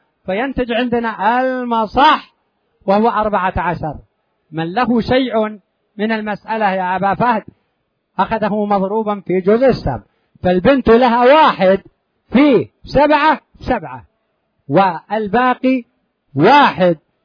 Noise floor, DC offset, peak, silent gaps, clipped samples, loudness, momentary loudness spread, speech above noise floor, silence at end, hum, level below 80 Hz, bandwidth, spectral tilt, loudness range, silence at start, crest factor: -68 dBFS; under 0.1%; 0 dBFS; none; under 0.1%; -15 LUFS; 12 LU; 54 dB; 0.3 s; none; -40 dBFS; 5.4 kHz; -8 dB/octave; 6 LU; 0.25 s; 16 dB